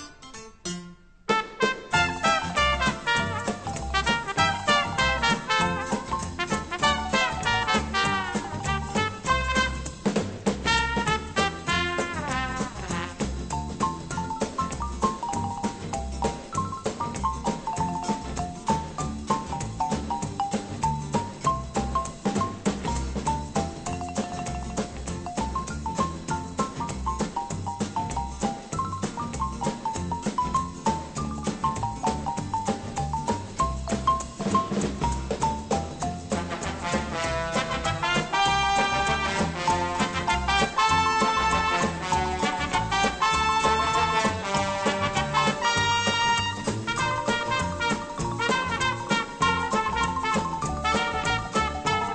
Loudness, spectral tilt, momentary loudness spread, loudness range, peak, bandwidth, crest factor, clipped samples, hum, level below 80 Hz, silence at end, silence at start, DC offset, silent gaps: -26 LUFS; -4 dB/octave; 9 LU; 7 LU; -8 dBFS; 10 kHz; 20 dB; under 0.1%; none; -40 dBFS; 0 s; 0 s; under 0.1%; none